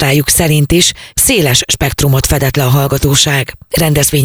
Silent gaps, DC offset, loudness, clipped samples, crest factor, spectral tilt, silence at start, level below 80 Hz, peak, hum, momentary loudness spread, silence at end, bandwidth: none; under 0.1%; -10 LUFS; under 0.1%; 10 dB; -3.5 dB/octave; 0 s; -26 dBFS; 0 dBFS; none; 3 LU; 0 s; over 20 kHz